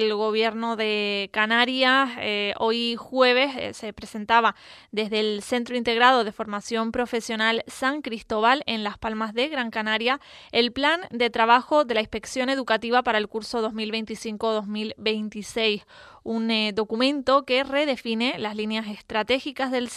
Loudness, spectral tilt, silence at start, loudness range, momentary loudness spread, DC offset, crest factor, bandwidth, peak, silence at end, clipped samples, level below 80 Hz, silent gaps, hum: -24 LUFS; -3.5 dB/octave; 0 s; 4 LU; 10 LU; under 0.1%; 20 dB; 13.5 kHz; -4 dBFS; 0 s; under 0.1%; -58 dBFS; none; none